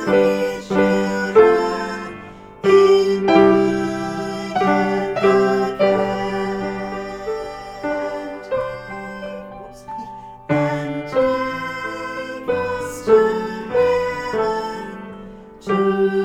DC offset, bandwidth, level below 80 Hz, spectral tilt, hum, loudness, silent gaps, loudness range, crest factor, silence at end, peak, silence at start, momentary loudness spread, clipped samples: under 0.1%; 12.5 kHz; -48 dBFS; -6 dB/octave; none; -19 LUFS; none; 10 LU; 18 dB; 0 s; 0 dBFS; 0 s; 18 LU; under 0.1%